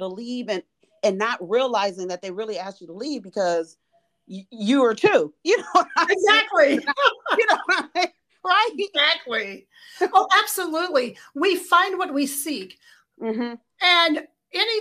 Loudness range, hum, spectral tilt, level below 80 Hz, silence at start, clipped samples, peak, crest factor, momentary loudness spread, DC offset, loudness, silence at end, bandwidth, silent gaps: 7 LU; none; -2.5 dB/octave; -74 dBFS; 0 s; under 0.1%; -4 dBFS; 18 dB; 15 LU; under 0.1%; -21 LUFS; 0 s; 15.5 kHz; none